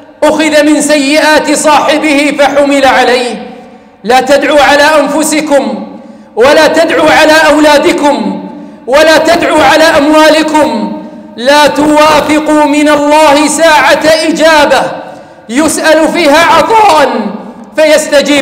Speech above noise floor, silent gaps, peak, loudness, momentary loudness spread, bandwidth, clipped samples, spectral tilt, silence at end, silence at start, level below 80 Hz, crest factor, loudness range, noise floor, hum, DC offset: 26 dB; none; 0 dBFS; -5 LUFS; 12 LU; 16.5 kHz; 0.3%; -3 dB/octave; 0 s; 0.2 s; -40 dBFS; 6 dB; 2 LU; -31 dBFS; none; under 0.1%